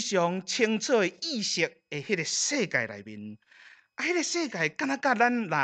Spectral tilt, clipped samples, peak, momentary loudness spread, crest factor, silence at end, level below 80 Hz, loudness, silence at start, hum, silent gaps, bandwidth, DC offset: -3 dB/octave; under 0.1%; -8 dBFS; 14 LU; 20 dB; 0 s; -80 dBFS; -27 LUFS; 0 s; none; none; 9.4 kHz; under 0.1%